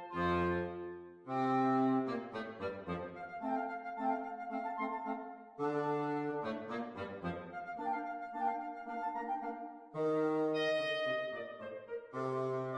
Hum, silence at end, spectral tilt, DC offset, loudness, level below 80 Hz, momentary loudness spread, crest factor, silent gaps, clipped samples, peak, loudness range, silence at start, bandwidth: none; 0 s; -7 dB/octave; under 0.1%; -38 LUFS; -68 dBFS; 11 LU; 14 dB; none; under 0.1%; -22 dBFS; 4 LU; 0 s; 10 kHz